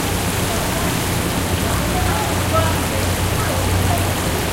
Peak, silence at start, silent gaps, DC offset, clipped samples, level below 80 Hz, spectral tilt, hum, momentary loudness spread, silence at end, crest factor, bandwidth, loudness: -4 dBFS; 0 s; none; under 0.1%; under 0.1%; -30 dBFS; -4 dB/octave; none; 2 LU; 0 s; 14 dB; 16 kHz; -19 LUFS